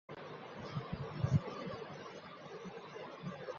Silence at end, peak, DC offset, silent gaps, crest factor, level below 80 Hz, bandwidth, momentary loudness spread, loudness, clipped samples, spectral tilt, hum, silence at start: 0 s; -20 dBFS; under 0.1%; none; 22 dB; -60 dBFS; 7.2 kHz; 14 LU; -43 LUFS; under 0.1%; -6.5 dB/octave; none; 0.1 s